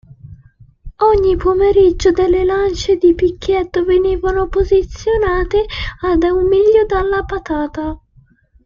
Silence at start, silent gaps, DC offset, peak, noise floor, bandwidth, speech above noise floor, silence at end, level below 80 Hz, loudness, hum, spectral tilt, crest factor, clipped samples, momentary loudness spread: 0.25 s; none; under 0.1%; -2 dBFS; -50 dBFS; 7.4 kHz; 37 dB; 0.7 s; -28 dBFS; -14 LUFS; none; -6.5 dB/octave; 12 dB; under 0.1%; 9 LU